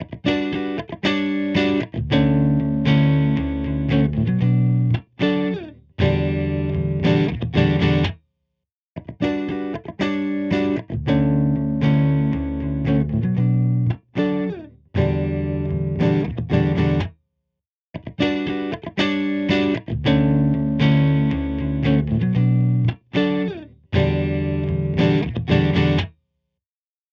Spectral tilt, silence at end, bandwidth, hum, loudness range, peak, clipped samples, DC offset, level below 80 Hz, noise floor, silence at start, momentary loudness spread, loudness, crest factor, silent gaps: -8.5 dB/octave; 1 s; 6.8 kHz; none; 4 LU; -4 dBFS; under 0.1%; under 0.1%; -36 dBFS; under -90 dBFS; 0 s; 8 LU; -20 LUFS; 16 dB; 8.72-8.95 s, 17.69-17.93 s